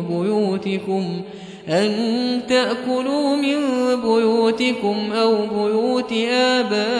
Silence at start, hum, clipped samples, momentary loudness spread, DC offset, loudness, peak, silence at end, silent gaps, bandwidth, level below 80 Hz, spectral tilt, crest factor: 0 s; none; under 0.1%; 6 LU; under 0.1%; -19 LUFS; -4 dBFS; 0 s; none; 11 kHz; -62 dBFS; -5 dB/octave; 14 dB